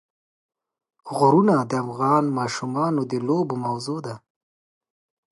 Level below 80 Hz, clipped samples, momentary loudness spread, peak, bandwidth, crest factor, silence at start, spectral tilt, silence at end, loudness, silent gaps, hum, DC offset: -70 dBFS; under 0.1%; 13 LU; -6 dBFS; 11.5 kHz; 18 dB; 1.05 s; -7 dB/octave; 1.15 s; -22 LUFS; none; none; under 0.1%